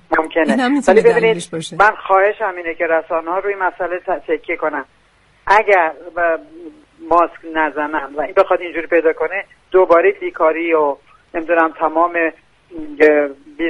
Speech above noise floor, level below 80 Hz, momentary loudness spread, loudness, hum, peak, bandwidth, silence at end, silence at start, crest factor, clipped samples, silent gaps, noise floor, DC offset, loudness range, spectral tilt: 38 dB; -50 dBFS; 10 LU; -16 LUFS; none; 0 dBFS; 11.5 kHz; 0 s; 0.1 s; 16 dB; under 0.1%; none; -53 dBFS; under 0.1%; 3 LU; -5 dB/octave